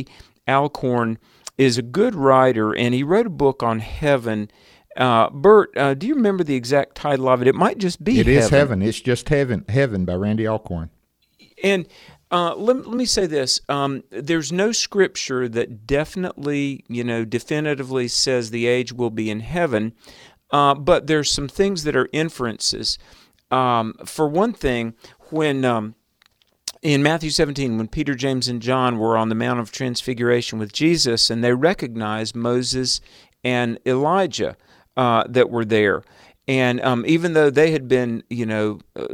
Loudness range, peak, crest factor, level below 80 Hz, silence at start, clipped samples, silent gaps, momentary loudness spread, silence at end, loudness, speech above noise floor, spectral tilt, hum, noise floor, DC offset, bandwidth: 4 LU; -2 dBFS; 18 dB; -44 dBFS; 0 s; under 0.1%; none; 10 LU; 0 s; -20 LUFS; 41 dB; -5 dB/octave; none; -61 dBFS; under 0.1%; 16 kHz